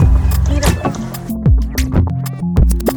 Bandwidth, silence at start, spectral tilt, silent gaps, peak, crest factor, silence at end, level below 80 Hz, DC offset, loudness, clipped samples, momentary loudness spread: over 20 kHz; 0 s; -6.5 dB/octave; none; 0 dBFS; 14 dB; 0 s; -16 dBFS; under 0.1%; -16 LUFS; under 0.1%; 6 LU